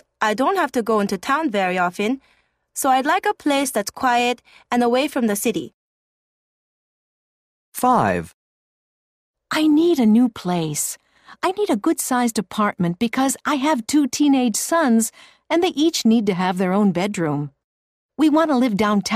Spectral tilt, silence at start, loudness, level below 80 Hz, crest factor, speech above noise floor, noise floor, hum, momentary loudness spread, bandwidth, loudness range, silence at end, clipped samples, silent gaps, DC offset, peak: -4.5 dB/octave; 0.2 s; -19 LUFS; -60 dBFS; 16 dB; over 71 dB; under -90 dBFS; none; 8 LU; 15.5 kHz; 6 LU; 0 s; under 0.1%; 5.74-7.72 s, 8.34-9.34 s, 17.64-18.09 s; under 0.1%; -4 dBFS